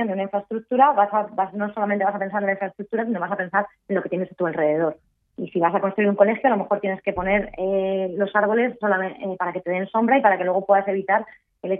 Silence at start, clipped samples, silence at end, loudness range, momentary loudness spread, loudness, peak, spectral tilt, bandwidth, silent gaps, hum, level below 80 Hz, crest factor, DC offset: 0 s; under 0.1%; 0 s; 3 LU; 9 LU; -22 LUFS; -2 dBFS; -10.5 dB/octave; 3.8 kHz; none; none; -56 dBFS; 20 dB; under 0.1%